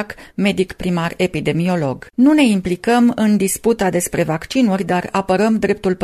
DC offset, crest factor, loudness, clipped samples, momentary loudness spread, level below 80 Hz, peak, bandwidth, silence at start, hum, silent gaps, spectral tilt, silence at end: under 0.1%; 14 dB; -17 LUFS; under 0.1%; 6 LU; -44 dBFS; -2 dBFS; 14.5 kHz; 0 s; none; none; -5.5 dB/octave; 0 s